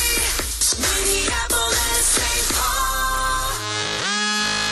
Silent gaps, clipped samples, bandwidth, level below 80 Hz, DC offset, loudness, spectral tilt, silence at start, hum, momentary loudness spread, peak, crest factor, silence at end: none; under 0.1%; 13 kHz; -30 dBFS; under 0.1%; -19 LUFS; -1 dB/octave; 0 s; none; 5 LU; -6 dBFS; 16 dB; 0 s